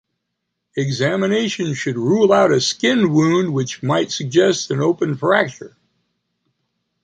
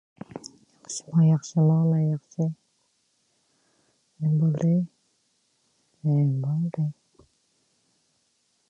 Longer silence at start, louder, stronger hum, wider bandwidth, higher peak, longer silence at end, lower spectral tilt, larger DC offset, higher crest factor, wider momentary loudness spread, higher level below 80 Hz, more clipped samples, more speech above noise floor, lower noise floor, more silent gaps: first, 0.75 s vs 0.35 s; first, -17 LUFS vs -25 LUFS; neither; about the same, 9.4 kHz vs 10 kHz; first, -2 dBFS vs -12 dBFS; second, 1.35 s vs 1.8 s; second, -5 dB/octave vs -8 dB/octave; neither; about the same, 16 dB vs 16 dB; second, 8 LU vs 20 LU; first, -60 dBFS vs -72 dBFS; neither; first, 59 dB vs 48 dB; first, -76 dBFS vs -70 dBFS; neither